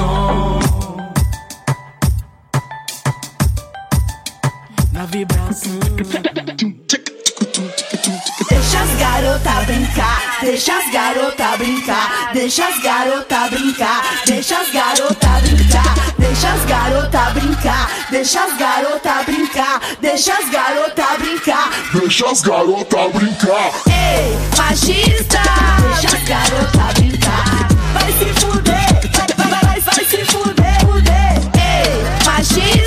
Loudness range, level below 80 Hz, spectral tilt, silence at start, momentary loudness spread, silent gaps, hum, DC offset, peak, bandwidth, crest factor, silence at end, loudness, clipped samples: 7 LU; -20 dBFS; -4 dB/octave; 0 s; 8 LU; none; none; under 0.1%; 0 dBFS; 16 kHz; 14 dB; 0 s; -14 LUFS; under 0.1%